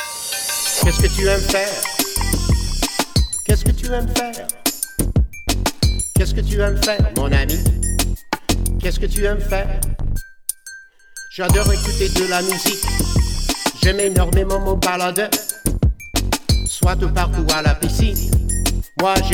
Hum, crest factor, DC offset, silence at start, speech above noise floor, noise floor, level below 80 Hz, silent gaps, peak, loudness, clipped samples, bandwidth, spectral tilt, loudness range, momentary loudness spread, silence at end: none; 16 dB; under 0.1%; 0 s; 23 dB; -39 dBFS; -22 dBFS; none; -2 dBFS; -19 LUFS; under 0.1%; over 20 kHz; -4 dB/octave; 3 LU; 6 LU; 0 s